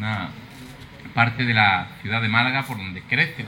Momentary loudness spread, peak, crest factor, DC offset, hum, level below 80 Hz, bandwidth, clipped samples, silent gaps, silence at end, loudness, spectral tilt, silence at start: 23 LU; -4 dBFS; 20 dB; under 0.1%; none; -54 dBFS; 17 kHz; under 0.1%; none; 0 s; -21 LUFS; -6 dB/octave; 0 s